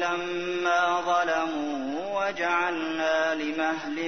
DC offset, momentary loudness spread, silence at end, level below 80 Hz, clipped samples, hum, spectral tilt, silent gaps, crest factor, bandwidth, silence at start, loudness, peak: 0.3%; 6 LU; 0 s; -64 dBFS; under 0.1%; none; -3.5 dB/octave; none; 16 dB; 6.6 kHz; 0 s; -26 LUFS; -12 dBFS